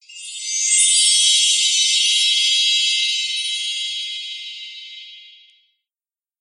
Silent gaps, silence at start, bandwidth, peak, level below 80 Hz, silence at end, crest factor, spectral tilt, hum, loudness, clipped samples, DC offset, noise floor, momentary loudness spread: none; 0.1 s; 11.5 kHz; -2 dBFS; under -90 dBFS; 1.15 s; 18 dB; 16 dB/octave; none; -14 LUFS; under 0.1%; under 0.1%; under -90 dBFS; 20 LU